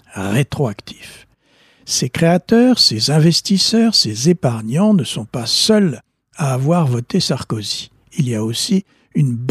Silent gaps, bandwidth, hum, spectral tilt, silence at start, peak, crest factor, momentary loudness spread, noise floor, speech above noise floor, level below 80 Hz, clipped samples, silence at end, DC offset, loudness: none; 15 kHz; none; -5 dB/octave; 0.15 s; -2 dBFS; 14 dB; 11 LU; -54 dBFS; 39 dB; -54 dBFS; under 0.1%; 0 s; under 0.1%; -16 LUFS